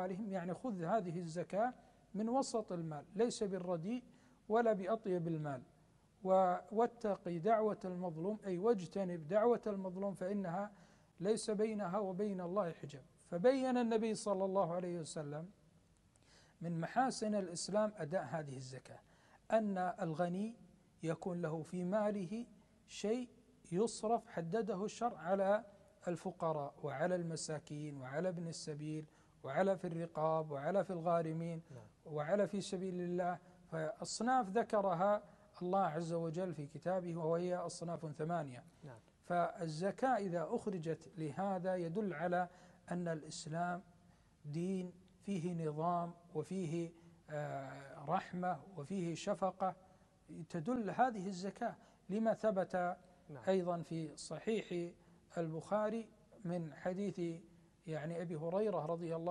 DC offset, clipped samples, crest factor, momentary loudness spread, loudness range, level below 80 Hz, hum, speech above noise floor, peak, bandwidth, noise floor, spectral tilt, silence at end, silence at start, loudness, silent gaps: under 0.1%; under 0.1%; 20 dB; 12 LU; 5 LU; -76 dBFS; none; 31 dB; -20 dBFS; 11.5 kHz; -70 dBFS; -6 dB/octave; 0 s; 0 s; -40 LUFS; none